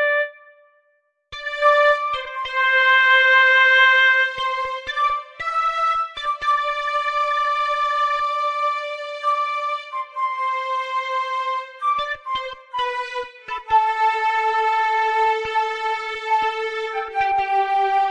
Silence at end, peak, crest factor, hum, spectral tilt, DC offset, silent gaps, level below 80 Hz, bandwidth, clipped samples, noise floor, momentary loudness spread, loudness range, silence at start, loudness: 0 s; -4 dBFS; 16 dB; none; -0.5 dB/octave; under 0.1%; none; -58 dBFS; 11 kHz; under 0.1%; -66 dBFS; 13 LU; 9 LU; 0 s; -19 LUFS